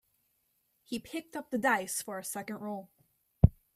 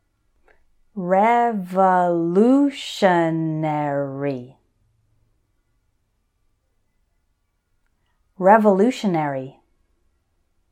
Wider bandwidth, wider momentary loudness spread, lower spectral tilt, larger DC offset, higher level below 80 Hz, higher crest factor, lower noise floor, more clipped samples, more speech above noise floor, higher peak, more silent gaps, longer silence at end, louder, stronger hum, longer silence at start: first, 16 kHz vs 14.5 kHz; about the same, 13 LU vs 12 LU; second, -5.5 dB/octave vs -7 dB/octave; neither; first, -44 dBFS vs -66 dBFS; first, 28 dB vs 20 dB; first, -76 dBFS vs -69 dBFS; neither; second, 41 dB vs 51 dB; second, -6 dBFS vs -2 dBFS; neither; second, 0.25 s vs 1.2 s; second, -33 LUFS vs -19 LUFS; neither; about the same, 0.9 s vs 0.95 s